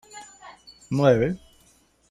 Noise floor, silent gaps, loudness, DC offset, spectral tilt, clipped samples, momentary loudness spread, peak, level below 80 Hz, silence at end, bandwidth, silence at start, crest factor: -60 dBFS; none; -22 LUFS; under 0.1%; -7 dB/octave; under 0.1%; 26 LU; -6 dBFS; -52 dBFS; 0.75 s; 13 kHz; 0.15 s; 20 dB